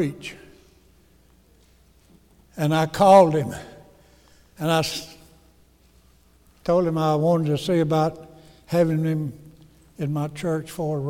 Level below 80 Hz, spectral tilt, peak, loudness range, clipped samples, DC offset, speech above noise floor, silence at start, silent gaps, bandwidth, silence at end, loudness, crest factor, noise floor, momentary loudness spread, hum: -54 dBFS; -6.5 dB/octave; -4 dBFS; 6 LU; under 0.1%; under 0.1%; 36 dB; 0 s; none; 16.5 kHz; 0 s; -22 LUFS; 20 dB; -57 dBFS; 18 LU; none